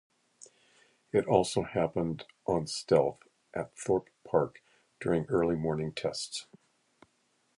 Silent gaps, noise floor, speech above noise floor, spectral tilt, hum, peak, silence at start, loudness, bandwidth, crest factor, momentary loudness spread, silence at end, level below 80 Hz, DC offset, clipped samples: none; -73 dBFS; 43 dB; -5.5 dB/octave; none; -8 dBFS; 1.15 s; -31 LUFS; 11.5 kHz; 24 dB; 11 LU; 1.15 s; -60 dBFS; under 0.1%; under 0.1%